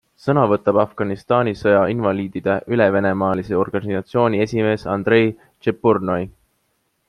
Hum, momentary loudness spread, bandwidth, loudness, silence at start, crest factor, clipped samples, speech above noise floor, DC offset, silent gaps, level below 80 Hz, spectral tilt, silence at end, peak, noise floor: none; 7 LU; 10.5 kHz; -19 LUFS; 0.25 s; 16 dB; under 0.1%; 50 dB; under 0.1%; none; -54 dBFS; -8 dB/octave; 0.8 s; -2 dBFS; -68 dBFS